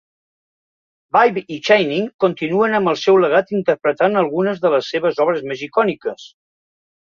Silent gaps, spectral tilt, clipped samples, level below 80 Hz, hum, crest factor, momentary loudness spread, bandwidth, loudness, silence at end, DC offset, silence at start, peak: 2.14-2.19 s; -6 dB/octave; under 0.1%; -64 dBFS; none; 16 dB; 7 LU; 7.2 kHz; -17 LUFS; 0.85 s; under 0.1%; 1.15 s; -2 dBFS